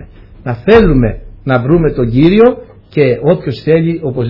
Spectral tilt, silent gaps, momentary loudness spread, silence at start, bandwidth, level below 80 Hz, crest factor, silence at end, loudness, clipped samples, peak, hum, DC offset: -10 dB/octave; none; 13 LU; 0 s; 6 kHz; -26 dBFS; 10 dB; 0 s; -11 LUFS; 0.5%; 0 dBFS; none; under 0.1%